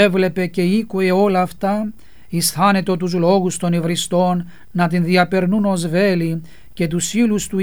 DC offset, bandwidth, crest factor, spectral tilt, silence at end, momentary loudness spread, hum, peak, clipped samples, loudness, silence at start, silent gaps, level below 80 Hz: 1%; over 20 kHz; 16 dB; -5.5 dB/octave; 0 s; 8 LU; none; -2 dBFS; under 0.1%; -18 LUFS; 0 s; none; -48 dBFS